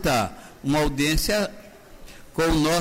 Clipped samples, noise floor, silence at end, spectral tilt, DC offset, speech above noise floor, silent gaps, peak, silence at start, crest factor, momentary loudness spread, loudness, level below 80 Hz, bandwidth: under 0.1%; -44 dBFS; 0 s; -4.5 dB/octave; under 0.1%; 22 dB; none; -12 dBFS; 0 s; 12 dB; 10 LU; -24 LUFS; -34 dBFS; 16 kHz